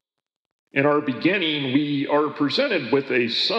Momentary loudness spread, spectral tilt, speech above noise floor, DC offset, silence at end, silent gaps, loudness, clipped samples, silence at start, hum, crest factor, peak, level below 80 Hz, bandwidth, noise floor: 2 LU; -6 dB/octave; 63 dB; under 0.1%; 0 s; none; -21 LUFS; under 0.1%; 0.75 s; none; 16 dB; -6 dBFS; -84 dBFS; 8.2 kHz; -85 dBFS